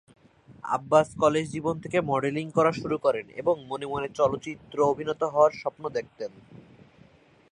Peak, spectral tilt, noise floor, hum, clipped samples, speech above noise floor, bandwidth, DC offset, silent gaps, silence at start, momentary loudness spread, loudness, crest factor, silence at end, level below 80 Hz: -6 dBFS; -6 dB/octave; -57 dBFS; none; under 0.1%; 31 dB; 10.5 kHz; under 0.1%; none; 0.5 s; 11 LU; -26 LUFS; 20 dB; 0.9 s; -62 dBFS